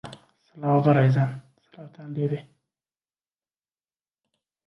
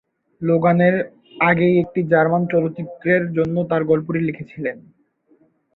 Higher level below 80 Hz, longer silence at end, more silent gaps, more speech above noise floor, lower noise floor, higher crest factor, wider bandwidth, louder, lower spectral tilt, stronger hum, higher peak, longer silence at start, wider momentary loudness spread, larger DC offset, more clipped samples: second, -68 dBFS vs -58 dBFS; first, 2.25 s vs 0.95 s; neither; first, over 67 dB vs 41 dB; first, under -90 dBFS vs -59 dBFS; about the same, 20 dB vs 18 dB; first, 6 kHz vs 4.2 kHz; second, -23 LUFS vs -19 LUFS; about the same, -9.5 dB/octave vs -10.5 dB/octave; neither; second, -8 dBFS vs -2 dBFS; second, 0.05 s vs 0.4 s; first, 23 LU vs 12 LU; neither; neither